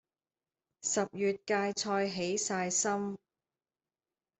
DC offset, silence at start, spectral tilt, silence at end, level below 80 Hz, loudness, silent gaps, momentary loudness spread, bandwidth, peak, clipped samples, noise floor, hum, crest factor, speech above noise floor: under 0.1%; 0.85 s; -3 dB/octave; 1.25 s; -76 dBFS; -33 LUFS; none; 7 LU; 8.4 kHz; -18 dBFS; under 0.1%; under -90 dBFS; none; 18 dB; over 57 dB